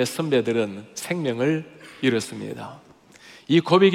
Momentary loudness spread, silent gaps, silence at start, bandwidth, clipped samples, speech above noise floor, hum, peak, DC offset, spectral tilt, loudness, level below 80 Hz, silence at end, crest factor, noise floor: 16 LU; none; 0 s; 16 kHz; under 0.1%; 27 dB; none; -4 dBFS; under 0.1%; -5.5 dB/octave; -23 LUFS; -70 dBFS; 0 s; 18 dB; -49 dBFS